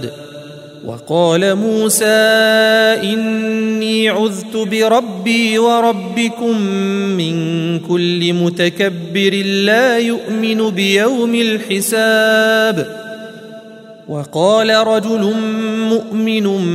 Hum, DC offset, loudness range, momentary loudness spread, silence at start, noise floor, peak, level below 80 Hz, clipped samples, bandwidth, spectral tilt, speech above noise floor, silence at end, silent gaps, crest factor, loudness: none; under 0.1%; 3 LU; 14 LU; 0 s; -36 dBFS; 0 dBFS; -64 dBFS; under 0.1%; 16 kHz; -4.5 dB/octave; 22 dB; 0 s; none; 14 dB; -14 LUFS